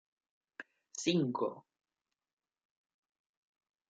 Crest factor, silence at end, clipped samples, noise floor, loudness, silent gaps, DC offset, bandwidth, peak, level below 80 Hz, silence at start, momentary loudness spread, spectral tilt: 22 dB; 2.3 s; under 0.1%; under -90 dBFS; -35 LUFS; none; under 0.1%; 8.8 kHz; -18 dBFS; -86 dBFS; 0.6 s; 22 LU; -5 dB/octave